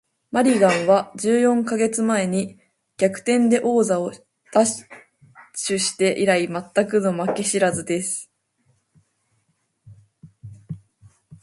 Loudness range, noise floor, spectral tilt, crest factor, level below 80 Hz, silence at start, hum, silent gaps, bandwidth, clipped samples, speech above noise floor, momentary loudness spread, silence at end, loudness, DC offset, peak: 7 LU; -69 dBFS; -4.5 dB/octave; 18 dB; -64 dBFS; 0.35 s; none; none; 11.5 kHz; under 0.1%; 50 dB; 12 LU; 0.1 s; -20 LUFS; under 0.1%; -4 dBFS